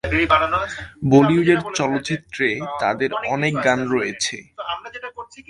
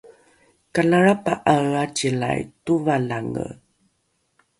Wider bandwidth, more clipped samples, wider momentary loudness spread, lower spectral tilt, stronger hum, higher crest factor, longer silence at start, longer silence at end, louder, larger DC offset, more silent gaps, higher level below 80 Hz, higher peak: about the same, 11.5 kHz vs 11.5 kHz; neither; first, 14 LU vs 11 LU; about the same, -5 dB/octave vs -5.5 dB/octave; neither; about the same, 20 dB vs 20 dB; about the same, 0.05 s vs 0.05 s; second, 0.1 s vs 1.05 s; about the same, -20 LUFS vs -21 LUFS; neither; neither; first, -44 dBFS vs -56 dBFS; about the same, 0 dBFS vs -2 dBFS